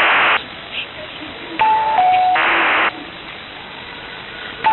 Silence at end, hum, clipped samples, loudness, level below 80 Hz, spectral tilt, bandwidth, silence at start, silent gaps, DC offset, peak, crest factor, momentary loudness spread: 0 s; none; under 0.1%; -15 LUFS; -52 dBFS; -6 dB/octave; 4.3 kHz; 0 s; none; under 0.1%; -4 dBFS; 14 dB; 17 LU